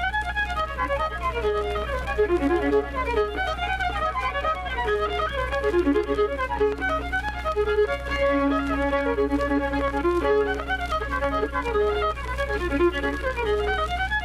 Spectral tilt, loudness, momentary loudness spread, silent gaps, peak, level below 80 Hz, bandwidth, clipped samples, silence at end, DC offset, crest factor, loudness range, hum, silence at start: -6 dB/octave; -25 LUFS; 4 LU; none; -12 dBFS; -34 dBFS; 13.5 kHz; under 0.1%; 0 s; under 0.1%; 14 dB; 1 LU; none; 0 s